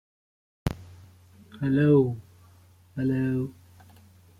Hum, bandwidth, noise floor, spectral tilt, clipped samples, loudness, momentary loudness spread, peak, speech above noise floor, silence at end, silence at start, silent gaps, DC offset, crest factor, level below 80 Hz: none; 15 kHz; -56 dBFS; -9 dB/octave; under 0.1%; -26 LUFS; 19 LU; -10 dBFS; 32 dB; 0.9 s; 0.65 s; none; under 0.1%; 18 dB; -52 dBFS